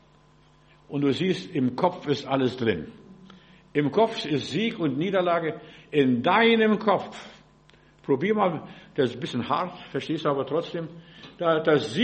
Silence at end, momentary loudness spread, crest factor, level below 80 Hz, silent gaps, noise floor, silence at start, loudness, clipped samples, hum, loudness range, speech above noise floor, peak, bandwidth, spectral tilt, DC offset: 0 s; 14 LU; 18 dB; -64 dBFS; none; -57 dBFS; 0.9 s; -25 LUFS; under 0.1%; none; 4 LU; 32 dB; -8 dBFS; 8.4 kHz; -6.5 dB/octave; under 0.1%